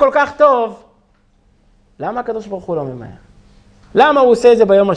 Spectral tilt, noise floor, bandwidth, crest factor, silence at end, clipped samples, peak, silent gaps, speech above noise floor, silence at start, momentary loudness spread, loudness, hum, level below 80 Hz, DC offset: -6 dB/octave; -55 dBFS; 10 kHz; 14 dB; 0 s; under 0.1%; 0 dBFS; none; 42 dB; 0 s; 15 LU; -13 LUFS; 50 Hz at -50 dBFS; -50 dBFS; under 0.1%